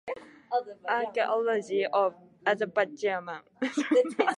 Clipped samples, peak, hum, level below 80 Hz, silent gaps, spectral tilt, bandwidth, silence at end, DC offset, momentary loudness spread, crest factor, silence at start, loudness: under 0.1%; -10 dBFS; none; -80 dBFS; none; -4.5 dB/octave; 11.5 kHz; 0 s; under 0.1%; 9 LU; 20 dB; 0.05 s; -29 LUFS